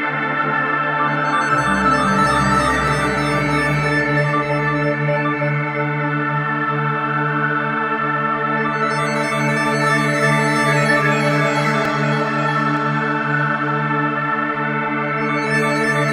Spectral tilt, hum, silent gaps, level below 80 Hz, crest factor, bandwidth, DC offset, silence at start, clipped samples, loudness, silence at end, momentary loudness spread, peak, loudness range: -5.5 dB/octave; none; none; -42 dBFS; 14 dB; 13 kHz; under 0.1%; 0 s; under 0.1%; -17 LUFS; 0 s; 4 LU; -4 dBFS; 3 LU